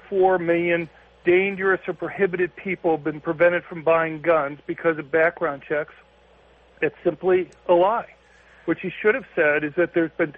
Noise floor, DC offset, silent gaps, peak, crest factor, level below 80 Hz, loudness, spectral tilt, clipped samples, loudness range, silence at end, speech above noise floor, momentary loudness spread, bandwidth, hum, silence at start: -54 dBFS; under 0.1%; none; -6 dBFS; 16 dB; -60 dBFS; -22 LUFS; -8.5 dB/octave; under 0.1%; 2 LU; 0.05 s; 32 dB; 8 LU; 3.9 kHz; none; 0.1 s